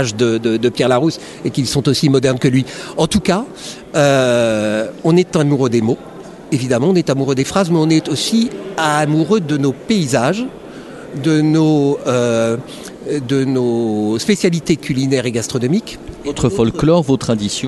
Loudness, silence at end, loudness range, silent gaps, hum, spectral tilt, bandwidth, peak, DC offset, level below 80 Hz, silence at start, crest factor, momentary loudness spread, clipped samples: -15 LUFS; 0 s; 2 LU; none; none; -5.5 dB/octave; 12.5 kHz; 0 dBFS; under 0.1%; -44 dBFS; 0 s; 14 dB; 10 LU; under 0.1%